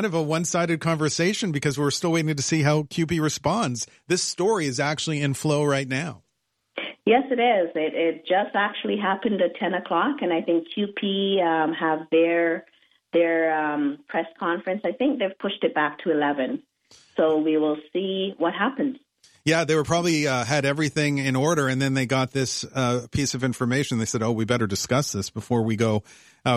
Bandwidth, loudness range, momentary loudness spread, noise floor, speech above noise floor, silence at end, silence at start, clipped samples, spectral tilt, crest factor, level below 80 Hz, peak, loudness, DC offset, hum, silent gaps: 14 kHz; 2 LU; 6 LU; -75 dBFS; 52 dB; 0 s; 0 s; under 0.1%; -5 dB/octave; 16 dB; -58 dBFS; -8 dBFS; -24 LUFS; under 0.1%; none; none